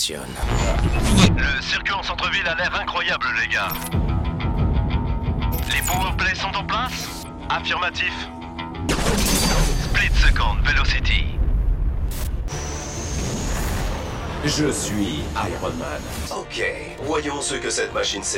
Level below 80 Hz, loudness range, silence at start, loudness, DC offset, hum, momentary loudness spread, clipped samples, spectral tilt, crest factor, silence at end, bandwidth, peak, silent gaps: -26 dBFS; 5 LU; 0 s; -22 LUFS; under 0.1%; none; 10 LU; under 0.1%; -4 dB/octave; 20 dB; 0 s; 16.5 kHz; -2 dBFS; none